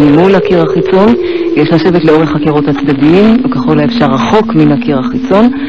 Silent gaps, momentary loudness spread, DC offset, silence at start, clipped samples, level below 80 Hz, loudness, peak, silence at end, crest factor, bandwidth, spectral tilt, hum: none; 5 LU; 2%; 0 s; under 0.1%; -36 dBFS; -8 LUFS; 0 dBFS; 0 s; 6 dB; 7.2 kHz; -8 dB/octave; none